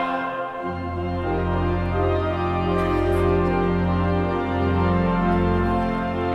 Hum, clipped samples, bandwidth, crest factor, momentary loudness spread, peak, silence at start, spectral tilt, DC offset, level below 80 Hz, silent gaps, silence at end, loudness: none; under 0.1%; 6 kHz; 12 dB; 7 LU; -8 dBFS; 0 s; -8.5 dB/octave; under 0.1%; -34 dBFS; none; 0 s; -22 LUFS